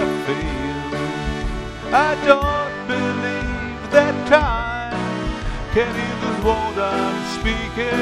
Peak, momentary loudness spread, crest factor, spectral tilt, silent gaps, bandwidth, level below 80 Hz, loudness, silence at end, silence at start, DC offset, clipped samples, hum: 0 dBFS; 10 LU; 20 dB; -5.5 dB/octave; none; 13 kHz; -32 dBFS; -20 LUFS; 0 s; 0 s; under 0.1%; under 0.1%; none